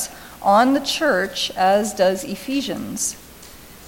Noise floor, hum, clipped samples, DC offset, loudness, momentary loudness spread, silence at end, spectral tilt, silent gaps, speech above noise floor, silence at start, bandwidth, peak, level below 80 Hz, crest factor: -42 dBFS; none; under 0.1%; under 0.1%; -20 LUFS; 11 LU; 0 s; -3 dB/octave; none; 23 dB; 0 s; 17 kHz; -4 dBFS; -52 dBFS; 16 dB